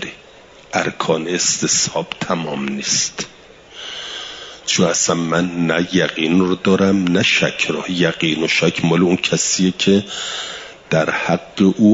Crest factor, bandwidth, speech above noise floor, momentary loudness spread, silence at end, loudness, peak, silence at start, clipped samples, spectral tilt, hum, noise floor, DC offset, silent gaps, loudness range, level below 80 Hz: 16 dB; 7.8 kHz; 27 dB; 12 LU; 0 s; -17 LUFS; -2 dBFS; 0 s; under 0.1%; -3.5 dB/octave; none; -43 dBFS; under 0.1%; none; 4 LU; -54 dBFS